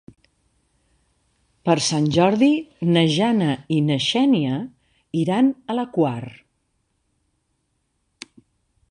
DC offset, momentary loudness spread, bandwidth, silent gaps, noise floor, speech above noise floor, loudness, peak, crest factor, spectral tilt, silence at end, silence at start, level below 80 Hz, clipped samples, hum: under 0.1%; 19 LU; 11 kHz; none; -71 dBFS; 52 dB; -20 LUFS; -2 dBFS; 20 dB; -5.5 dB/octave; 2.6 s; 1.65 s; -60 dBFS; under 0.1%; none